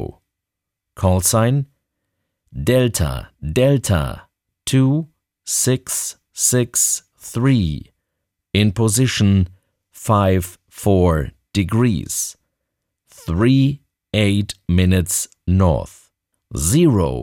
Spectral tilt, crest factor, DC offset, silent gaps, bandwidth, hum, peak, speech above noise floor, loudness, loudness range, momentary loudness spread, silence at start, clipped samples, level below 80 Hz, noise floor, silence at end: -5 dB/octave; 16 dB; under 0.1%; none; 18.5 kHz; none; -2 dBFS; 65 dB; -18 LUFS; 2 LU; 14 LU; 0 s; under 0.1%; -36 dBFS; -82 dBFS; 0 s